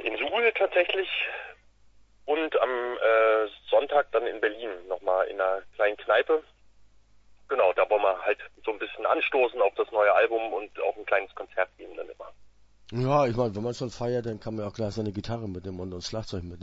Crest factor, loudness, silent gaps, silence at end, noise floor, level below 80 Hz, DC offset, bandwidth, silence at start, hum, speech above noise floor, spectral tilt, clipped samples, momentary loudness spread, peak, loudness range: 18 dB; -27 LUFS; none; 0 s; -57 dBFS; -58 dBFS; under 0.1%; 8 kHz; 0 s; none; 30 dB; -5.5 dB/octave; under 0.1%; 12 LU; -8 dBFS; 4 LU